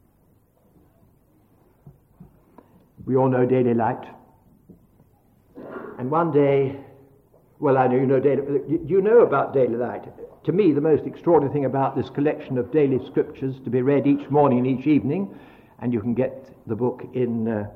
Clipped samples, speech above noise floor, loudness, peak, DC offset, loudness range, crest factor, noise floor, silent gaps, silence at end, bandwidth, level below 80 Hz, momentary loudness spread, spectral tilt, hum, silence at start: under 0.1%; 39 dB; -21 LUFS; -6 dBFS; under 0.1%; 5 LU; 16 dB; -60 dBFS; none; 0 s; 4.4 kHz; -60 dBFS; 13 LU; -11 dB/octave; none; 1.85 s